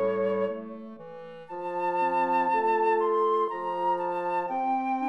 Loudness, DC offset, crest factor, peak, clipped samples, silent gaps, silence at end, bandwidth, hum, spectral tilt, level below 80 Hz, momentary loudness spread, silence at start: -27 LUFS; 0.1%; 12 dB; -14 dBFS; under 0.1%; none; 0 s; 8.6 kHz; none; -7 dB/octave; -76 dBFS; 17 LU; 0 s